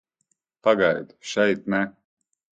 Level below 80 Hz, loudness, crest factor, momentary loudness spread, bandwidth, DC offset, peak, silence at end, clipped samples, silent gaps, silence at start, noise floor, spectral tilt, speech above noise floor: -64 dBFS; -23 LUFS; 20 dB; 10 LU; 9 kHz; under 0.1%; -4 dBFS; 0.7 s; under 0.1%; none; 0.65 s; -74 dBFS; -5 dB/octave; 51 dB